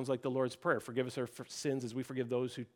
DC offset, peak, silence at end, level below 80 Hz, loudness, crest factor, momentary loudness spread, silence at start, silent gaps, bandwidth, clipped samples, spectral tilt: under 0.1%; -18 dBFS; 0.1 s; -82 dBFS; -37 LUFS; 18 dB; 5 LU; 0 s; none; 17.5 kHz; under 0.1%; -5.5 dB/octave